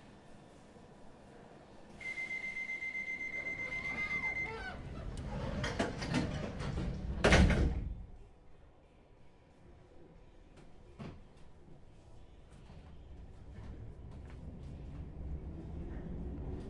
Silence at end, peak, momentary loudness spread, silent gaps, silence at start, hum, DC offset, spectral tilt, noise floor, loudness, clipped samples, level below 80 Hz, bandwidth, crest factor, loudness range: 0 s; -12 dBFS; 23 LU; none; 0 s; none; under 0.1%; -5.5 dB/octave; -61 dBFS; -37 LUFS; under 0.1%; -46 dBFS; 11.5 kHz; 26 dB; 23 LU